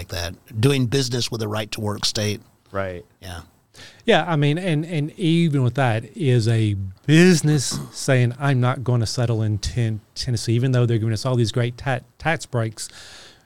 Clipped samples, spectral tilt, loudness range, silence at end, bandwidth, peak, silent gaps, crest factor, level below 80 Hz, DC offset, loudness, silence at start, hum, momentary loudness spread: under 0.1%; -5.5 dB/octave; 5 LU; 0 s; 15.5 kHz; -4 dBFS; none; 18 dB; -46 dBFS; 0.5%; -21 LUFS; 0 s; none; 11 LU